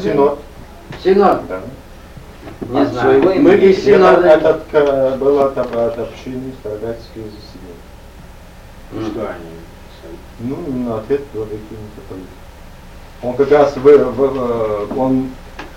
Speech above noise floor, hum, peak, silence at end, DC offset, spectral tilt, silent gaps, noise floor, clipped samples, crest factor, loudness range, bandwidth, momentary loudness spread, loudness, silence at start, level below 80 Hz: 22 dB; none; 0 dBFS; 0 s; under 0.1%; -7 dB/octave; none; -37 dBFS; under 0.1%; 14 dB; 17 LU; 15 kHz; 23 LU; -14 LUFS; 0 s; -38 dBFS